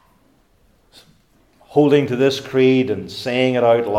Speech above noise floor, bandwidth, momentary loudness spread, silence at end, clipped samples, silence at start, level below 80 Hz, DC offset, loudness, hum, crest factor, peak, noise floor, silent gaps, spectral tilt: 41 dB; 14 kHz; 8 LU; 0 s; under 0.1%; 1.7 s; -62 dBFS; under 0.1%; -17 LUFS; none; 18 dB; -2 dBFS; -57 dBFS; none; -6.5 dB/octave